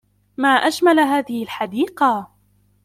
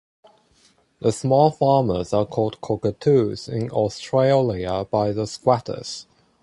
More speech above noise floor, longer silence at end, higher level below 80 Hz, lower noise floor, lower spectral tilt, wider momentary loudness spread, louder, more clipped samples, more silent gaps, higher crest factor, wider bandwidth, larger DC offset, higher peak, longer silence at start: about the same, 41 dB vs 39 dB; first, 0.6 s vs 0.4 s; second, -64 dBFS vs -50 dBFS; about the same, -59 dBFS vs -59 dBFS; second, -3.5 dB/octave vs -6.5 dB/octave; first, 11 LU vs 8 LU; first, -18 LUFS vs -21 LUFS; neither; neither; about the same, 16 dB vs 18 dB; first, 16 kHz vs 11.5 kHz; neither; about the same, -4 dBFS vs -4 dBFS; second, 0.4 s vs 1 s